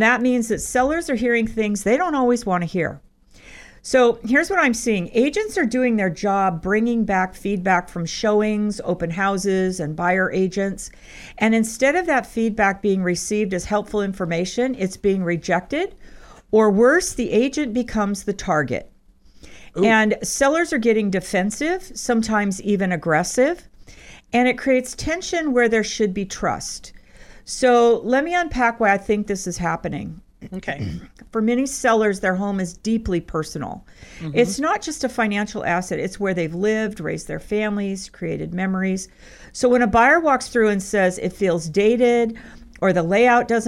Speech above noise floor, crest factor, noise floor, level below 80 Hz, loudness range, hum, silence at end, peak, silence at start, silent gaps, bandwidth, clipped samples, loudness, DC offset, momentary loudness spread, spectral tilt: 30 dB; 16 dB; -50 dBFS; -44 dBFS; 4 LU; none; 0 s; -4 dBFS; 0 s; none; 15 kHz; under 0.1%; -20 LUFS; under 0.1%; 11 LU; -5 dB/octave